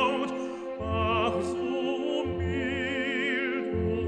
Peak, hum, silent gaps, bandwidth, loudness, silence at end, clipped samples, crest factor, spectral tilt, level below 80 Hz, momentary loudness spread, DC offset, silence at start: -14 dBFS; none; none; 10 kHz; -29 LUFS; 0 s; under 0.1%; 16 dB; -6 dB/octave; -46 dBFS; 5 LU; under 0.1%; 0 s